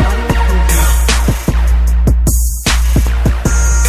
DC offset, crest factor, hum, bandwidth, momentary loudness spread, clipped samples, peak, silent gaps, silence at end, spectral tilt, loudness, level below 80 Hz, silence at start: under 0.1%; 10 dB; none; 16 kHz; 3 LU; under 0.1%; 0 dBFS; none; 0 s; -4.5 dB/octave; -13 LUFS; -12 dBFS; 0 s